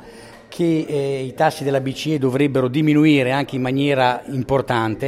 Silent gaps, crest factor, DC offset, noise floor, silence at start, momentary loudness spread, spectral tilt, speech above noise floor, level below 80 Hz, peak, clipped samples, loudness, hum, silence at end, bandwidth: none; 16 dB; under 0.1%; -41 dBFS; 0 s; 7 LU; -6.5 dB/octave; 23 dB; -50 dBFS; -2 dBFS; under 0.1%; -19 LUFS; none; 0 s; 14 kHz